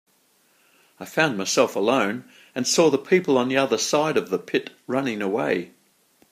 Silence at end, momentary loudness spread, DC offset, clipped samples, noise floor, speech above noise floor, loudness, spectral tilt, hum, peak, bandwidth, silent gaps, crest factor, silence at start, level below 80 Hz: 0.65 s; 9 LU; under 0.1%; under 0.1%; -63 dBFS; 41 dB; -22 LUFS; -3.5 dB/octave; none; -2 dBFS; 15.5 kHz; none; 20 dB; 1 s; -72 dBFS